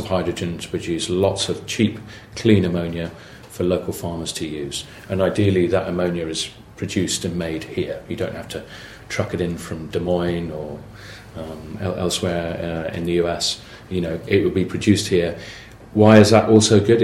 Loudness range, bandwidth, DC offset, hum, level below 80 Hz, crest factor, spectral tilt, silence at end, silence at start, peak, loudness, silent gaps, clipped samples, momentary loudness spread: 8 LU; 16 kHz; under 0.1%; none; -46 dBFS; 20 dB; -5.5 dB/octave; 0 s; 0 s; 0 dBFS; -20 LUFS; none; under 0.1%; 18 LU